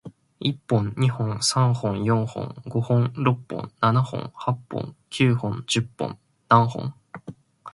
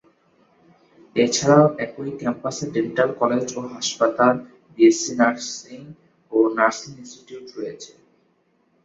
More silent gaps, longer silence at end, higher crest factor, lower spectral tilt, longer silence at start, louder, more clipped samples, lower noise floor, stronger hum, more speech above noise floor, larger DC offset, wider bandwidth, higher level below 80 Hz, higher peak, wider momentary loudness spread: neither; second, 0.05 s vs 1 s; about the same, 22 dB vs 20 dB; about the same, -5.5 dB/octave vs -4.5 dB/octave; second, 0.05 s vs 1.15 s; second, -24 LUFS vs -20 LUFS; neither; second, -43 dBFS vs -64 dBFS; neither; second, 20 dB vs 43 dB; neither; first, 11.5 kHz vs 8 kHz; first, -56 dBFS vs -64 dBFS; about the same, -2 dBFS vs -2 dBFS; second, 14 LU vs 23 LU